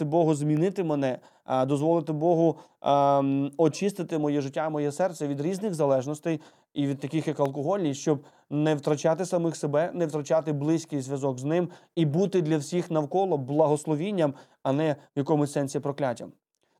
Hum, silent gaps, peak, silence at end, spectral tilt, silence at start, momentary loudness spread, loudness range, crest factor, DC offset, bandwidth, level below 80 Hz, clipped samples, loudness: none; none; -8 dBFS; 0.5 s; -7 dB/octave; 0 s; 7 LU; 3 LU; 18 dB; under 0.1%; 13.5 kHz; -82 dBFS; under 0.1%; -27 LUFS